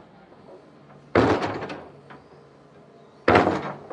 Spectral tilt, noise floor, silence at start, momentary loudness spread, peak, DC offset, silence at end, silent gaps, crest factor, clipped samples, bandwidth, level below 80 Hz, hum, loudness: -6.5 dB/octave; -51 dBFS; 0.5 s; 18 LU; 0 dBFS; under 0.1%; 0.05 s; none; 26 dB; under 0.1%; 10.5 kHz; -52 dBFS; none; -22 LUFS